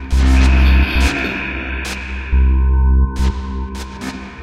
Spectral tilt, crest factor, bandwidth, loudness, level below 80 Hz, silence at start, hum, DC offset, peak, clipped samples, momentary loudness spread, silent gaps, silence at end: -6 dB/octave; 12 dB; 10 kHz; -16 LUFS; -14 dBFS; 0 s; none; under 0.1%; -2 dBFS; under 0.1%; 14 LU; none; 0 s